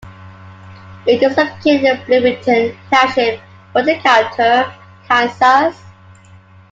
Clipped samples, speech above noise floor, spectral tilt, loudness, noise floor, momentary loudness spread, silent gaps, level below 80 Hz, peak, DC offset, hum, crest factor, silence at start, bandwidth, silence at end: under 0.1%; 29 dB; -4.5 dB/octave; -14 LUFS; -42 dBFS; 8 LU; none; -54 dBFS; 0 dBFS; under 0.1%; none; 14 dB; 0.05 s; 7.8 kHz; 0.8 s